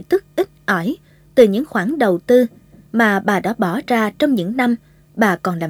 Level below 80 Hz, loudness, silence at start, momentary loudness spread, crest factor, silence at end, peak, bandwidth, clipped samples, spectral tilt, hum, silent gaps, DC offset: -56 dBFS; -17 LUFS; 0 s; 9 LU; 18 dB; 0 s; 0 dBFS; 20 kHz; under 0.1%; -6 dB/octave; none; none; under 0.1%